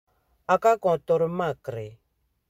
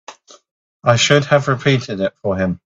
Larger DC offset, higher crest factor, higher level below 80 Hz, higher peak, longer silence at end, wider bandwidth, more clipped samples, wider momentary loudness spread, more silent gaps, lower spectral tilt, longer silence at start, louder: neither; about the same, 18 dB vs 18 dB; second, -62 dBFS vs -52 dBFS; second, -8 dBFS vs 0 dBFS; first, 0.6 s vs 0.1 s; first, 16 kHz vs 7.8 kHz; neither; first, 17 LU vs 9 LU; second, none vs 0.51-0.80 s; first, -6.5 dB/octave vs -4.5 dB/octave; first, 0.5 s vs 0.1 s; second, -24 LUFS vs -16 LUFS